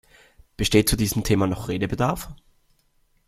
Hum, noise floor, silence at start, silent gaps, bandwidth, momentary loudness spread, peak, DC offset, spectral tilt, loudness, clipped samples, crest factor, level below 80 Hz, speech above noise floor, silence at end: none; -64 dBFS; 0.6 s; none; 16 kHz; 9 LU; -2 dBFS; under 0.1%; -5 dB/octave; -23 LUFS; under 0.1%; 22 dB; -38 dBFS; 42 dB; 0.95 s